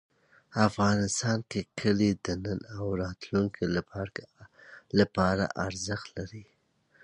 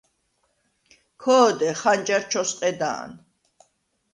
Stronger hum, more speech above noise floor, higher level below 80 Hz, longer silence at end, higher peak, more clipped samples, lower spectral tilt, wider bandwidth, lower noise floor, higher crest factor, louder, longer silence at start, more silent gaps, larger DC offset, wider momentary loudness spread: neither; second, 35 dB vs 49 dB; first, -52 dBFS vs -70 dBFS; second, 0.6 s vs 0.95 s; about the same, -8 dBFS vs -6 dBFS; neither; first, -5.5 dB/octave vs -3 dB/octave; about the same, 11 kHz vs 11 kHz; second, -64 dBFS vs -70 dBFS; about the same, 22 dB vs 20 dB; second, -30 LUFS vs -22 LUFS; second, 0.5 s vs 1.2 s; neither; neither; about the same, 12 LU vs 12 LU